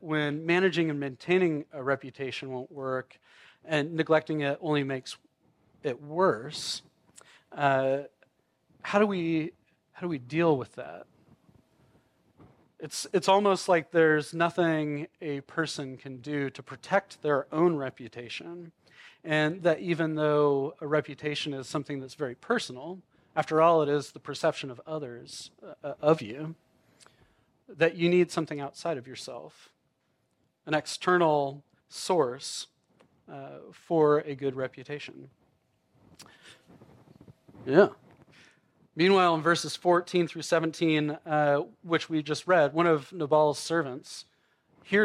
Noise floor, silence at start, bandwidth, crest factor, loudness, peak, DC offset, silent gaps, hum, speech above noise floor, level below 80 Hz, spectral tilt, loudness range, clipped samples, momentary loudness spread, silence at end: -74 dBFS; 0 s; 13.5 kHz; 24 dB; -28 LUFS; -4 dBFS; under 0.1%; none; none; 46 dB; -76 dBFS; -5.5 dB/octave; 5 LU; under 0.1%; 18 LU; 0 s